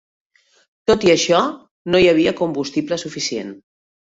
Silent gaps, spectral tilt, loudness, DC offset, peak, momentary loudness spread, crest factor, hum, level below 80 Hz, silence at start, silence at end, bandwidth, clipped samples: 1.71-1.85 s; -4 dB/octave; -18 LUFS; under 0.1%; -2 dBFS; 11 LU; 16 dB; none; -50 dBFS; 0.9 s; 0.6 s; 8 kHz; under 0.1%